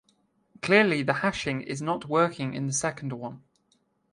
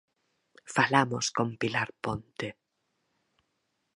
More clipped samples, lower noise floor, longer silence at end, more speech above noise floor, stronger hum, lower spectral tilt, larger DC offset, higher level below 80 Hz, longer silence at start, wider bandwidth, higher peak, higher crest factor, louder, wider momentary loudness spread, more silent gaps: neither; second, -70 dBFS vs -79 dBFS; second, 0.75 s vs 1.45 s; second, 43 dB vs 50 dB; neither; about the same, -4.5 dB/octave vs -4 dB/octave; neither; about the same, -62 dBFS vs -66 dBFS; about the same, 0.65 s vs 0.65 s; about the same, 11.5 kHz vs 11.5 kHz; about the same, -6 dBFS vs -6 dBFS; about the same, 22 dB vs 26 dB; first, -26 LUFS vs -29 LUFS; about the same, 15 LU vs 14 LU; neither